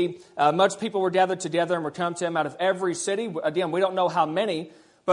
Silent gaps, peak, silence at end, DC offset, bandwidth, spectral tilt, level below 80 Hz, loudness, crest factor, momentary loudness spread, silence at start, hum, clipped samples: none; -6 dBFS; 0 s; under 0.1%; 11 kHz; -4.5 dB/octave; -74 dBFS; -25 LUFS; 18 dB; 6 LU; 0 s; none; under 0.1%